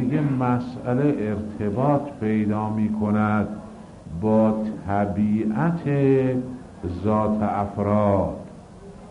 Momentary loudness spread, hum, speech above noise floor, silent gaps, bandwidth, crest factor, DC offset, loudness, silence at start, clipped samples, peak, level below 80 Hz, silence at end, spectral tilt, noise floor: 16 LU; none; 20 dB; none; 10 kHz; 16 dB; under 0.1%; -23 LUFS; 0 s; under 0.1%; -8 dBFS; -50 dBFS; 0 s; -9.5 dB/octave; -42 dBFS